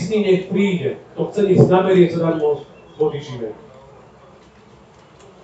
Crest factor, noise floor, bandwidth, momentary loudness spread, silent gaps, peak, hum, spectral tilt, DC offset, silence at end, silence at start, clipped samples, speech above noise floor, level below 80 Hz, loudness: 18 dB; -47 dBFS; 8 kHz; 16 LU; none; 0 dBFS; none; -8 dB/octave; under 0.1%; 1.9 s; 0 s; under 0.1%; 30 dB; -56 dBFS; -17 LUFS